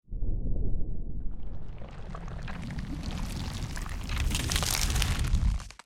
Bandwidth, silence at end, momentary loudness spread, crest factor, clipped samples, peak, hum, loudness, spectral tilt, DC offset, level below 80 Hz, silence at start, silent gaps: 17 kHz; 0.1 s; 15 LU; 24 dB; under 0.1%; -6 dBFS; none; -33 LUFS; -3.5 dB/octave; under 0.1%; -32 dBFS; 0.1 s; none